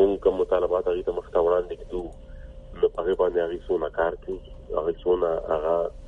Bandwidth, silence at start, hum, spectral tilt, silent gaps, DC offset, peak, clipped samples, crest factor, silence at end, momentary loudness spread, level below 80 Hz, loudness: 4 kHz; 0 s; none; -7.5 dB/octave; none; under 0.1%; -8 dBFS; under 0.1%; 18 dB; 0 s; 14 LU; -44 dBFS; -25 LUFS